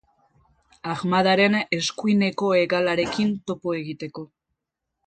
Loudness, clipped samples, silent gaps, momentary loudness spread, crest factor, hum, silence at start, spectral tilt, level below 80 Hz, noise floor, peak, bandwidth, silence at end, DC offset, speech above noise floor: -22 LUFS; under 0.1%; none; 15 LU; 18 dB; none; 0.85 s; -5 dB/octave; -60 dBFS; -82 dBFS; -6 dBFS; 9 kHz; 0.8 s; under 0.1%; 60 dB